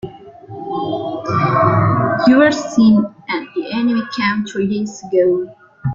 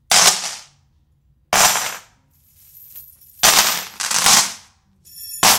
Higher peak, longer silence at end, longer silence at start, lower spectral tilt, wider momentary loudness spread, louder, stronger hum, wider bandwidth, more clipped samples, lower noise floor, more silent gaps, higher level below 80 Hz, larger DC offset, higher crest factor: about the same, -2 dBFS vs 0 dBFS; about the same, 0 s vs 0 s; about the same, 0.05 s vs 0.1 s; first, -6.5 dB/octave vs 1 dB/octave; second, 13 LU vs 23 LU; about the same, -16 LUFS vs -14 LUFS; neither; second, 7.6 kHz vs 19 kHz; neither; second, -35 dBFS vs -59 dBFS; neither; about the same, -50 dBFS vs -52 dBFS; neither; second, 14 dB vs 20 dB